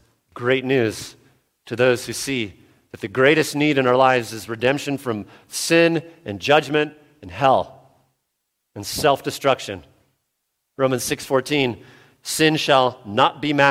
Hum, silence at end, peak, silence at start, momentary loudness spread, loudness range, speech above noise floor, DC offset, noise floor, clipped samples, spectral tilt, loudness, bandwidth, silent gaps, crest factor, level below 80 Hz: none; 0 s; 0 dBFS; 0.35 s; 16 LU; 5 LU; 56 dB; under 0.1%; -76 dBFS; under 0.1%; -4 dB/octave; -20 LUFS; 16.5 kHz; none; 22 dB; -58 dBFS